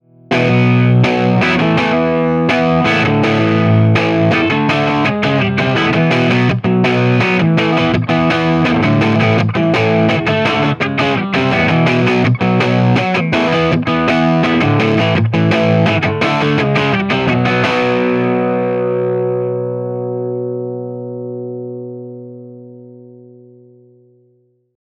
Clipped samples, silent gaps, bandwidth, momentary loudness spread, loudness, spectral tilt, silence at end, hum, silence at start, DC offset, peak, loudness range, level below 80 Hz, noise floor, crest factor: under 0.1%; none; 9.2 kHz; 9 LU; -13 LUFS; -7 dB/octave; 1.75 s; 60 Hz at -40 dBFS; 0.3 s; under 0.1%; 0 dBFS; 10 LU; -44 dBFS; -56 dBFS; 14 dB